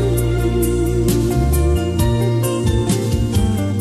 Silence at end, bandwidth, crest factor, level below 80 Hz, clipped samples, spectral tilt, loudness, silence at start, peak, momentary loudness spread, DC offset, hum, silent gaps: 0 s; 14.5 kHz; 12 dB; -22 dBFS; under 0.1%; -6.5 dB/octave; -17 LUFS; 0 s; -4 dBFS; 1 LU; under 0.1%; none; none